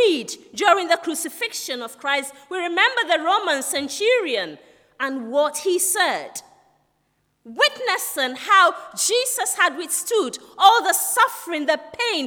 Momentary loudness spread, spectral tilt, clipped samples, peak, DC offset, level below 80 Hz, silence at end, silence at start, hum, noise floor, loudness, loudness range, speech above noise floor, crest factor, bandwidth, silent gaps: 12 LU; 0 dB/octave; under 0.1%; -2 dBFS; under 0.1%; -74 dBFS; 0 s; 0 s; none; -68 dBFS; -20 LUFS; 4 LU; 48 dB; 20 dB; over 20 kHz; none